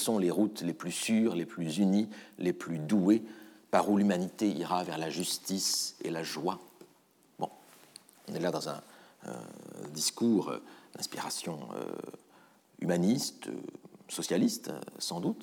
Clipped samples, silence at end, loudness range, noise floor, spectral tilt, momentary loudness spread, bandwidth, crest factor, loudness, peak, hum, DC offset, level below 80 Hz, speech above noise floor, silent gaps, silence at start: under 0.1%; 0 s; 8 LU; -66 dBFS; -4.5 dB/octave; 17 LU; 19.5 kHz; 22 dB; -32 LUFS; -12 dBFS; none; under 0.1%; -86 dBFS; 34 dB; none; 0 s